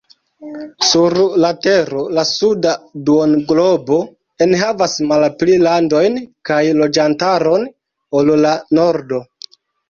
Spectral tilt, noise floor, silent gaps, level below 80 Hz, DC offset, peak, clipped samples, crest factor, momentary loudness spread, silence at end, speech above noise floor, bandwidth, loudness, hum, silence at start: -4.5 dB/octave; -40 dBFS; none; -54 dBFS; under 0.1%; -2 dBFS; under 0.1%; 12 dB; 8 LU; 0.65 s; 26 dB; 7.4 kHz; -14 LUFS; none; 0.4 s